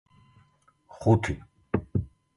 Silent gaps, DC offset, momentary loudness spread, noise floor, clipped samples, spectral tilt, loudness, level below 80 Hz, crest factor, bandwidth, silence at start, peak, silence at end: none; under 0.1%; 10 LU; -64 dBFS; under 0.1%; -8 dB/octave; -28 LUFS; -46 dBFS; 22 dB; 11.5 kHz; 0.95 s; -8 dBFS; 0.3 s